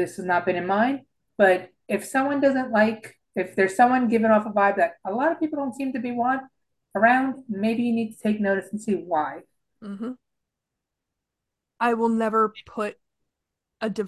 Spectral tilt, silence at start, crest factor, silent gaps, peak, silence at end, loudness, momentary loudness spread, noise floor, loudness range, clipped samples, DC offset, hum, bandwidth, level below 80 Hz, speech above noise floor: -6 dB/octave; 0 s; 18 dB; none; -6 dBFS; 0 s; -23 LUFS; 14 LU; -84 dBFS; 8 LU; under 0.1%; under 0.1%; none; 12.5 kHz; -66 dBFS; 61 dB